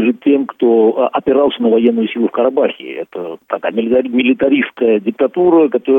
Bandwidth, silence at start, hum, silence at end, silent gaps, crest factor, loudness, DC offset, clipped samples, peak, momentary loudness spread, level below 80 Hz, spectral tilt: 3.8 kHz; 0 s; none; 0 s; none; 14 dB; -14 LUFS; under 0.1%; under 0.1%; 0 dBFS; 10 LU; -56 dBFS; -8.5 dB/octave